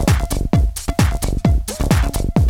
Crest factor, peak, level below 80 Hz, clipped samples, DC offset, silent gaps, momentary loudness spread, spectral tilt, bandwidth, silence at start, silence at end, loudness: 14 dB; -2 dBFS; -20 dBFS; under 0.1%; under 0.1%; none; 2 LU; -6 dB/octave; 18 kHz; 0 s; 0 s; -18 LUFS